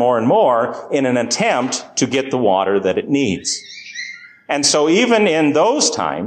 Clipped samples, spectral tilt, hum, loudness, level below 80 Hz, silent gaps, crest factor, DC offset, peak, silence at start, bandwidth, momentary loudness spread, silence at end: under 0.1%; -3.5 dB/octave; none; -16 LUFS; -56 dBFS; none; 14 dB; under 0.1%; -2 dBFS; 0 s; 12 kHz; 12 LU; 0 s